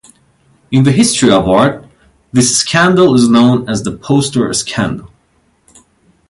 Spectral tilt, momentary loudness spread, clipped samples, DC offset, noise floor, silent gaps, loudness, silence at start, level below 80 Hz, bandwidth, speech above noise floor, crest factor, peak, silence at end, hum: -4.5 dB/octave; 10 LU; under 0.1%; under 0.1%; -56 dBFS; none; -11 LUFS; 0.7 s; -42 dBFS; 11.5 kHz; 45 dB; 12 dB; 0 dBFS; 1.25 s; none